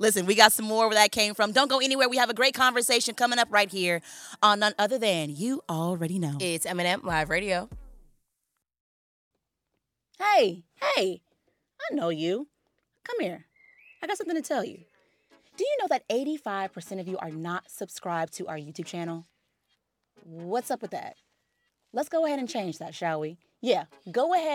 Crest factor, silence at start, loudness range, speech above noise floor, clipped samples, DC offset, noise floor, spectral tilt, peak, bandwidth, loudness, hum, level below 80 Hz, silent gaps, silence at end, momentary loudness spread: 28 dB; 0 s; 12 LU; 55 dB; under 0.1%; under 0.1%; -82 dBFS; -3 dB/octave; 0 dBFS; 17.5 kHz; -26 LUFS; none; -60 dBFS; 8.80-9.31 s; 0 s; 15 LU